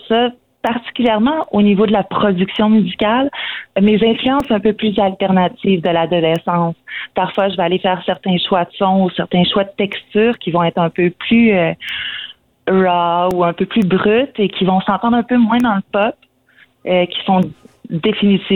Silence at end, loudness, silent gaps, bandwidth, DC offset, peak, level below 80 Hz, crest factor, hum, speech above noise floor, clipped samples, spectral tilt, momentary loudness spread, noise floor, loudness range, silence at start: 0 s; -15 LUFS; none; 4.3 kHz; under 0.1%; -4 dBFS; -50 dBFS; 12 dB; none; 37 dB; under 0.1%; -8 dB/octave; 8 LU; -51 dBFS; 2 LU; 0.05 s